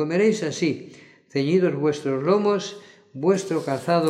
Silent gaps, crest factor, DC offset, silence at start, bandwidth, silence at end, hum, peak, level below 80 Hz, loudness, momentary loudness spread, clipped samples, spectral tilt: none; 16 dB; under 0.1%; 0 s; 12 kHz; 0 s; none; -8 dBFS; -74 dBFS; -23 LUFS; 12 LU; under 0.1%; -6 dB/octave